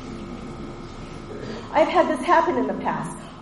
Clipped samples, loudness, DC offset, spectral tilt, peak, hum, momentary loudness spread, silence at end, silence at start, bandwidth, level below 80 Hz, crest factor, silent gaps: under 0.1%; -22 LUFS; under 0.1%; -5.5 dB/octave; -4 dBFS; none; 18 LU; 0 s; 0 s; 11.5 kHz; -46 dBFS; 20 dB; none